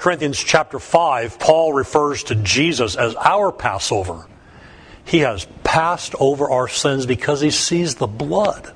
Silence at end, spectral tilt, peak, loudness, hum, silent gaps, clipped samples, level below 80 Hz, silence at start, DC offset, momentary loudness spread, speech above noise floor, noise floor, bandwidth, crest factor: 0.05 s; -4 dB/octave; 0 dBFS; -18 LUFS; none; none; under 0.1%; -44 dBFS; 0 s; under 0.1%; 5 LU; 25 dB; -43 dBFS; 10.5 kHz; 18 dB